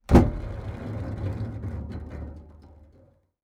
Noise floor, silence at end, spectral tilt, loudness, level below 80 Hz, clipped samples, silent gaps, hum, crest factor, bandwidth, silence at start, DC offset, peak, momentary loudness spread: -59 dBFS; 0.6 s; -8.5 dB/octave; -29 LUFS; -32 dBFS; under 0.1%; none; none; 24 dB; 12 kHz; 0.1 s; under 0.1%; -2 dBFS; 19 LU